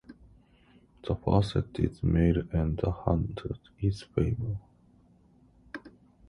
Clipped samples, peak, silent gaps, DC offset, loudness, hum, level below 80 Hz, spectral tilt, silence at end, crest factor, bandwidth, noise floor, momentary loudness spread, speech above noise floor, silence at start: under 0.1%; -10 dBFS; none; under 0.1%; -30 LUFS; none; -40 dBFS; -8.5 dB/octave; 0.4 s; 20 dB; 10.5 kHz; -61 dBFS; 16 LU; 33 dB; 0.1 s